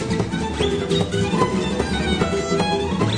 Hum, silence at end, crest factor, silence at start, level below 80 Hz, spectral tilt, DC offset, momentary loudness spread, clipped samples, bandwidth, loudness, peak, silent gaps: none; 0 s; 16 dB; 0 s; -36 dBFS; -5.5 dB/octave; under 0.1%; 2 LU; under 0.1%; 10 kHz; -21 LUFS; -6 dBFS; none